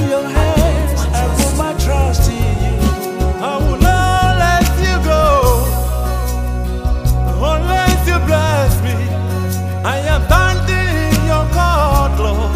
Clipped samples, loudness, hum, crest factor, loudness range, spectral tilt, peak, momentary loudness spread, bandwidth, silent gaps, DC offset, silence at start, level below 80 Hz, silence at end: under 0.1%; -15 LUFS; none; 14 dB; 2 LU; -5.5 dB/octave; 0 dBFS; 6 LU; 16 kHz; none; under 0.1%; 0 s; -16 dBFS; 0 s